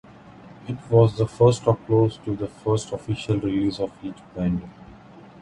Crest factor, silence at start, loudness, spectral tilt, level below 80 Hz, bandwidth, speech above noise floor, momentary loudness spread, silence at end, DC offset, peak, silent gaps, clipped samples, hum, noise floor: 20 dB; 0.6 s; -23 LUFS; -7.5 dB/octave; -48 dBFS; 11 kHz; 24 dB; 16 LU; 0.2 s; under 0.1%; -2 dBFS; none; under 0.1%; none; -46 dBFS